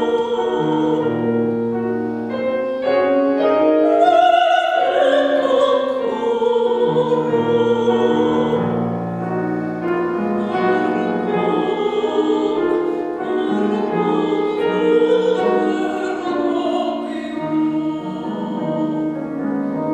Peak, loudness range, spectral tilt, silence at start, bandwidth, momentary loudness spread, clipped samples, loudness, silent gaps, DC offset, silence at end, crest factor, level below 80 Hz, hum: -2 dBFS; 5 LU; -7 dB/octave; 0 s; 9 kHz; 8 LU; under 0.1%; -18 LUFS; none; under 0.1%; 0 s; 16 dB; -58 dBFS; none